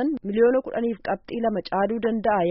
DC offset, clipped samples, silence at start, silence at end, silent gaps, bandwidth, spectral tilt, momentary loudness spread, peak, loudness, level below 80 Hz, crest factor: under 0.1%; under 0.1%; 0 s; 0 s; none; 5.6 kHz; -5 dB/octave; 7 LU; -8 dBFS; -24 LUFS; -54 dBFS; 14 dB